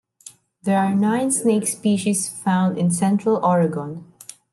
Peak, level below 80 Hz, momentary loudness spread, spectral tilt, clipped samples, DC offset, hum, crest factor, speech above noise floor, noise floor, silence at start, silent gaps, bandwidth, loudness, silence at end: -8 dBFS; -68 dBFS; 12 LU; -5.5 dB/octave; under 0.1%; under 0.1%; none; 14 dB; 27 dB; -47 dBFS; 0.25 s; none; 12.5 kHz; -20 LUFS; 0.5 s